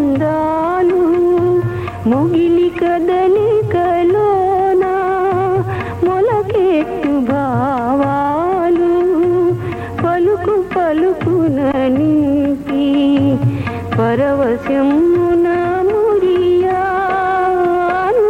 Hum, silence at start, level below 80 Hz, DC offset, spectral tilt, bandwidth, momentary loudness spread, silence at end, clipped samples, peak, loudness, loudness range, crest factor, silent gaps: none; 0 s; -42 dBFS; under 0.1%; -8.5 dB/octave; 8.6 kHz; 4 LU; 0 s; under 0.1%; -4 dBFS; -14 LUFS; 1 LU; 10 dB; none